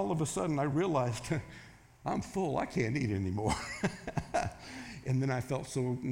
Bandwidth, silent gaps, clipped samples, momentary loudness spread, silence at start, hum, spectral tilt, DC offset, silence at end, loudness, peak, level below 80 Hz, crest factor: 16.5 kHz; none; under 0.1%; 10 LU; 0 s; none; -6 dB/octave; under 0.1%; 0 s; -34 LUFS; -16 dBFS; -56 dBFS; 18 dB